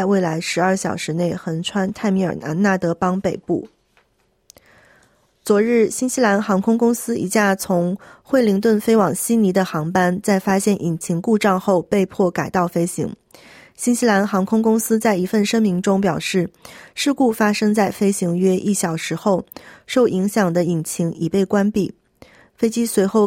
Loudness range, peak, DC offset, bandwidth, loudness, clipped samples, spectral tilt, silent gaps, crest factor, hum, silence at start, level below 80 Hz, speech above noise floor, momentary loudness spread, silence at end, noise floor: 4 LU; -4 dBFS; under 0.1%; 16.5 kHz; -19 LUFS; under 0.1%; -5.5 dB/octave; none; 16 dB; none; 0 s; -56 dBFS; 45 dB; 6 LU; 0 s; -63 dBFS